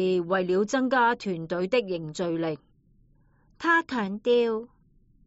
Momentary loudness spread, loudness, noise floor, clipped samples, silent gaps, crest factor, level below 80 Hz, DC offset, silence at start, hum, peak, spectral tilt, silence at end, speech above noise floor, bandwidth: 8 LU; -26 LUFS; -61 dBFS; under 0.1%; none; 16 dB; -64 dBFS; under 0.1%; 0 s; none; -12 dBFS; -4 dB/octave; 0.6 s; 36 dB; 8 kHz